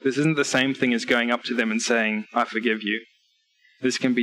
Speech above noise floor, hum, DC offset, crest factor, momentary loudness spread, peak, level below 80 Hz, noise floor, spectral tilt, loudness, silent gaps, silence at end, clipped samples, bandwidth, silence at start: 43 dB; none; under 0.1%; 16 dB; 5 LU; -8 dBFS; -70 dBFS; -66 dBFS; -4 dB/octave; -23 LUFS; none; 0 s; under 0.1%; 12.5 kHz; 0.05 s